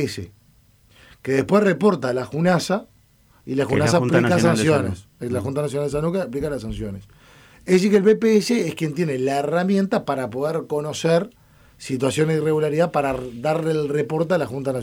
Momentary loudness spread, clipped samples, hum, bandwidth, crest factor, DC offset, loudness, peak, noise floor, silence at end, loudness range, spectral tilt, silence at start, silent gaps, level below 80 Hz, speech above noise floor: 12 LU; under 0.1%; none; 16.5 kHz; 14 dB; under 0.1%; -21 LUFS; -6 dBFS; -56 dBFS; 0 s; 3 LU; -6 dB/octave; 0 s; none; -50 dBFS; 35 dB